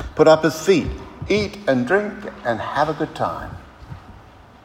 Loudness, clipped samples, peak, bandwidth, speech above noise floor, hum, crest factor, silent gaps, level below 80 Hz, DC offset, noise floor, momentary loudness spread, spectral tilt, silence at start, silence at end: -20 LUFS; under 0.1%; 0 dBFS; 16 kHz; 26 dB; none; 20 dB; none; -42 dBFS; under 0.1%; -45 dBFS; 25 LU; -5.5 dB/octave; 0 s; 0.45 s